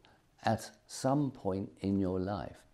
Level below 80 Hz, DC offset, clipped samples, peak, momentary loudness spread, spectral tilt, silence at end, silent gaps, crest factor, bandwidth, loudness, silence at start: -66 dBFS; under 0.1%; under 0.1%; -14 dBFS; 6 LU; -6.5 dB/octave; 0.15 s; none; 20 dB; 14 kHz; -35 LUFS; 0.4 s